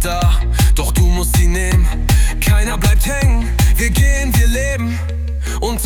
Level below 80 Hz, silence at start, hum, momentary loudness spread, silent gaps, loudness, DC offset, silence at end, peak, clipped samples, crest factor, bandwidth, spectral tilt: -14 dBFS; 0 s; none; 6 LU; none; -15 LUFS; under 0.1%; 0 s; -2 dBFS; under 0.1%; 12 dB; 19 kHz; -4.5 dB/octave